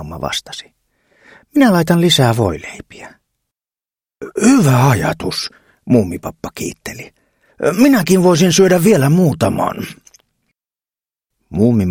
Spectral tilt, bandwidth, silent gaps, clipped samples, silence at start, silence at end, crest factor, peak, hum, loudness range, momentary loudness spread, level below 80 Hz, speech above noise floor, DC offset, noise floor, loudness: -5.5 dB/octave; 17 kHz; none; under 0.1%; 0 s; 0 s; 16 dB; 0 dBFS; none; 4 LU; 18 LU; -46 dBFS; over 77 dB; under 0.1%; under -90 dBFS; -13 LUFS